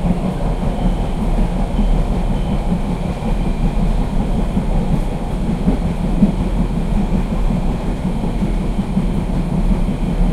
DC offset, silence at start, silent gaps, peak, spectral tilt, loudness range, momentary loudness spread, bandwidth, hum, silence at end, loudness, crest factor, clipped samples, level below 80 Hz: under 0.1%; 0 s; none; 0 dBFS; -8 dB/octave; 1 LU; 3 LU; 11 kHz; none; 0 s; -20 LUFS; 16 dB; under 0.1%; -18 dBFS